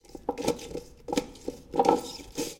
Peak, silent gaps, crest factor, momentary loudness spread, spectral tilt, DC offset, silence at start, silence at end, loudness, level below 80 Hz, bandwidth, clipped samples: -4 dBFS; none; 26 dB; 16 LU; -4 dB/octave; under 0.1%; 0.1 s; 0 s; -30 LUFS; -54 dBFS; 17 kHz; under 0.1%